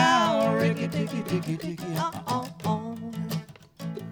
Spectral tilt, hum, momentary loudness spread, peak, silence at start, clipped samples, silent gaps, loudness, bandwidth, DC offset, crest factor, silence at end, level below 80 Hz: -5.5 dB/octave; none; 12 LU; -8 dBFS; 0 s; under 0.1%; none; -28 LUFS; over 20 kHz; under 0.1%; 20 dB; 0 s; -62 dBFS